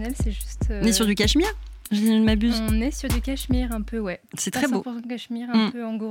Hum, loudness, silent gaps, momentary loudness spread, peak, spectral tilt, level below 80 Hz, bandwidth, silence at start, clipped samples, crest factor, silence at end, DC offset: none; -24 LUFS; none; 11 LU; -8 dBFS; -4.5 dB/octave; -32 dBFS; 17 kHz; 0 s; under 0.1%; 16 dB; 0 s; under 0.1%